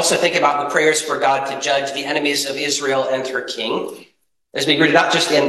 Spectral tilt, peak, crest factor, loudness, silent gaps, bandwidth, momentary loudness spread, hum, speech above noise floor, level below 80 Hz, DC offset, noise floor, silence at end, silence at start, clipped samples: -2.5 dB/octave; 0 dBFS; 18 dB; -17 LUFS; none; 13 kHz; 9 LU; none; 42 dB; -64 dBFS; under 0.1%; -59 dBFS; 0 s; 0 s; under 0.1%